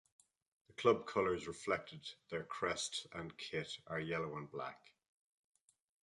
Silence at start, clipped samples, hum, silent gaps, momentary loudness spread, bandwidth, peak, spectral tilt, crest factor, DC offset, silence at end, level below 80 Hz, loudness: 0.7 s; under 0.1%; none; none; 14 LU; 11.5 kHz; -18 dBFS; -4 dB/octave; 24 dB; under 0.1%; 1.25 s; -72 dBFS; -40 LUFS